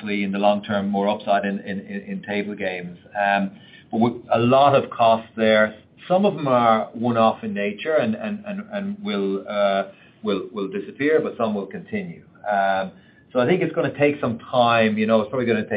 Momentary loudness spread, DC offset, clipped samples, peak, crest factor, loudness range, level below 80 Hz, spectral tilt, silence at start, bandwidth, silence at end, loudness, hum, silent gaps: 12 LU; under 0.1%; under 0.1%; -4 dBFS; 18 dB; 6 LU; -66 dBFS; -10.5 dB/octave; 0 s; 5 kHz; 0 s; -22 LUFS; none; none